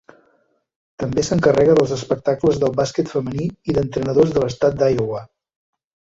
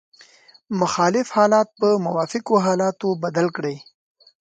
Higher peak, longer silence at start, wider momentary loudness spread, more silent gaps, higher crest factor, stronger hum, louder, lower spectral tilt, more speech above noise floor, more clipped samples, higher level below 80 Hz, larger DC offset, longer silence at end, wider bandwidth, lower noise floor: about the same, -2 dBFS vs -4 dBFS; first, 1 s vs 0.7 s; about the same, 10 LU vs 10 LU; neither; about the same, 16 dB vs 18 dB; neither; about the same, -19 LUFS vs -20 LUFS; about the same, -6.5 dB/octave vs -5.5 dB/octave; first, 45 dB vs 31 dB; neither; first, -46 dBFS vs -68 dBFS; neither; first, 0.85 s vs 0.65 s; second, 8 kHz vs 9.4 kHz; first, -62 dBFS vs -51 dBFS